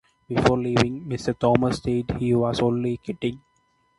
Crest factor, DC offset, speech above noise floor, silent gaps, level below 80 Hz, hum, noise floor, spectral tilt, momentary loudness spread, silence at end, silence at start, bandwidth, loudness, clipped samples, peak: 22 dB; under 0.1%; 44 dB; none; -46 dBFS; none; -66 dBFS; -6.5 dB/octave; 8 LU; 0.6 s; 0.3 s; 11.5 kHz; -24 LUFS; under 0.1%; -2 dBFS